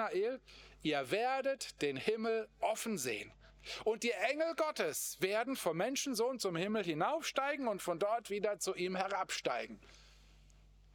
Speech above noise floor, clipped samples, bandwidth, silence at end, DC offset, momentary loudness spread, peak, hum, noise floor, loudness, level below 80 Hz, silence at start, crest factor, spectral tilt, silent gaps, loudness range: 25 dB; under 0.1%; over 20 kHz; 0.8 s; under 0.1%; 6 LU; -16 dBFS; none; -62 dBFS; -37 LUFS; -68 dBFS; 0 s; 22 dB; -3.5 dB/octave; none; 2 LU